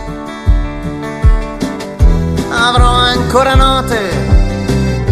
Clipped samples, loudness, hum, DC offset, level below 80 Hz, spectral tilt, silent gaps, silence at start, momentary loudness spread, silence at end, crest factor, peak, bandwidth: 0.1%; -13 LUFS; none; under 0.1%; -14 dBFS; -5.5 dB/octave; none; 0 s; 11 LU; 0 s; 12 dB; 0 dBFS; 13.5 kHz